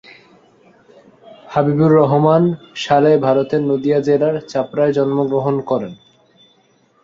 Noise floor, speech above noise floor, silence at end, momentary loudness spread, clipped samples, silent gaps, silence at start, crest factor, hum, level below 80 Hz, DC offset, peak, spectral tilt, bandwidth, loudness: -56 dBFS; 41 dB; 1.1 s; 9 LU; under 0.1%; none; 1.45 s; 16 dB; none; -58 dBFS; under 0.1%; -2 dBFS; -8 dB/octave; 7.6 kHz; -16 LUFS